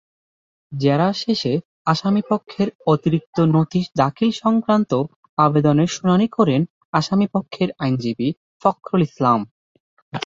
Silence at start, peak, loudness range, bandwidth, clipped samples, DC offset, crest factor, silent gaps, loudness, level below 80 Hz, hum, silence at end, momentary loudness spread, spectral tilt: 0.7 s; -2 dBFS; 3 LU; 7.8 kHz; under 0.1%; under 0.1%; 18 dB; 1.65-1.85 s, 2.75-2.79 s, 3.26-3.33 s, 5.16-5.23 s, 5.29-5.37 s, 6.70-6.93 s, 8.37-8.60 s, 9.51-10.12 s; -19 LUFS; -58 dBFS; none; 0 s; 6 LU; -7 dB/octave